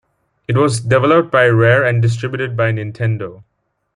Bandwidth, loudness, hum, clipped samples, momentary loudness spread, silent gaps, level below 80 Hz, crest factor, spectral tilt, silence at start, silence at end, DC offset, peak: 11 kHz; -15 LUFS; none; under 0.1%; 9 LU; none; -52 dBFS; 14 dB; -6.5 dB/octave; 0.5 s; 0.55 s; under 0.1%; -2 dBFS